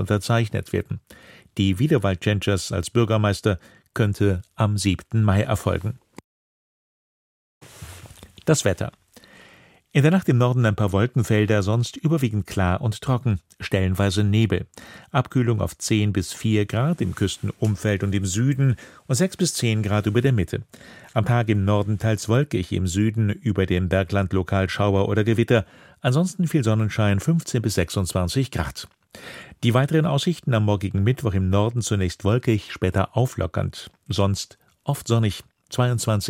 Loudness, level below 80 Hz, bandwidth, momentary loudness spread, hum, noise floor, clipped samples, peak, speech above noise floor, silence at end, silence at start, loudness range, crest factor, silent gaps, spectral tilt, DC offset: -22 LUFS; -46 dBFS; 16 kHz; 9 LU; none; -52 dBFS; under 0.1%; -4 dBFS; 31 dB; 0 s; 0 s; 3 LU; 18 dB; 6.24-7.61 s; -6 dB/octave; under 0.1%